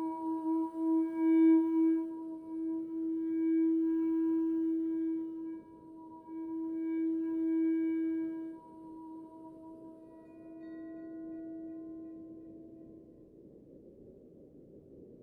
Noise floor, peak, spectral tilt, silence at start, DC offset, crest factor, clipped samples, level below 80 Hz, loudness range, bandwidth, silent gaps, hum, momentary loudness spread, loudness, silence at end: -56 dBFS; -18 dBFS; -9 dB/octave; 0 s; under 0.1%; 16 dB; under 0.1%; -74 dBFS; 18 LU; 2.4 kHz; none; none; 22 LU; -33 LUFS; 0 s